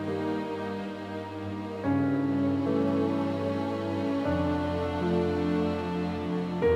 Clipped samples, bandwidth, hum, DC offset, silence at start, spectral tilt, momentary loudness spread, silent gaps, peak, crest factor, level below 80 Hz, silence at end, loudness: under 0.1%; 9.8 kHz; none; under 0.1%; 0 s; -8 dB/octave; 9 LU; none; -14 dBFS; 14 dB; -52 dBFS; 0 s; -29 LUFS